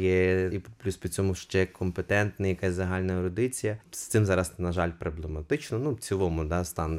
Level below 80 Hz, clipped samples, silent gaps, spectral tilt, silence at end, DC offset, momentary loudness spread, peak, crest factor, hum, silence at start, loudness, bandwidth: -44 dBFS; under 0.1%; none; -6 dB/octave; 0 s; under 0.1%; 8 LU; -12 dBFS; 16 dB; none; 0 s; -29 LUFS; 16 kHz